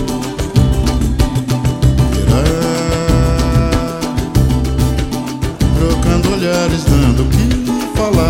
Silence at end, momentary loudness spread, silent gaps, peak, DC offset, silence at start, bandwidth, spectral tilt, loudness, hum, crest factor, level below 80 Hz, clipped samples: 0 s; 5 LU; none; 0 dBFS; under 0.1%; 0 s; 16.5 kHz; -6 dB/octave; -14 LUFS; none; 12 dB; -18 dBFS; under 0.1%